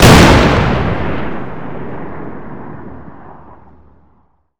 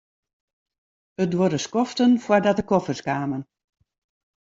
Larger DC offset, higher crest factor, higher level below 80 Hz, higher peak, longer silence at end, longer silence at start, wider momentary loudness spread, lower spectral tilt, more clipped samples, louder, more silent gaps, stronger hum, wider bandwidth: neither; second, 14 dB vs 20 dB; first, -22 dBFS vs -60 dBFS; first, 0 dBFS vs -4 dBFS; second, 0 s vs 1.05 s; second, 0 s vs 1.2 s; first, 25 LU vs 9 LU; about the same, -5 dB/octave vs -6 dB/octave; first, 1% vs under 0.1%; first, -11 LUFS vs -22 LUFS; neither; neither; first, over 20 kHz vs 7.8 kHz